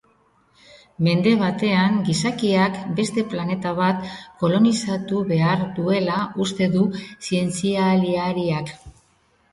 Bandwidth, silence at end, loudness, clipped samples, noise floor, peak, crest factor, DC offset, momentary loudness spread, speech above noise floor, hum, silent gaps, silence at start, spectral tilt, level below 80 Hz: 11.5 kHz; 0.65 s; -21 LUFS; under 0.1%; -61 dBFS; -4 dBFS; 16 dB; under 0.1%; 7 LU; 41 dB; none; none; 0.75 s; -6 dB/octave; -56 dBFS